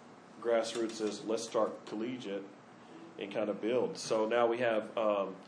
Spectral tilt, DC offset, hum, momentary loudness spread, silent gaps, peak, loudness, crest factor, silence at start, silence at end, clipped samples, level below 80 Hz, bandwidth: -4 dB/octave; under 0.1%; none; 15 LU; none; -16 dBFS; -34 LUFS; 18 dB; 0 s; 0 s; under 0.1%; -86 dBFS; 10.5 kHz